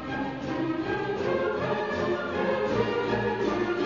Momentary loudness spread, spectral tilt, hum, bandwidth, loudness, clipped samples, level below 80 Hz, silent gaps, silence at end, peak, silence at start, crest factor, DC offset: 4 LU; -6.5 dB/octave; none; 7.4 kHz; -28 LUFS; under 0.1%; -54 dBFS; none; 0 s; -12 dBFS; 0 s; 16 dB; under 0.1%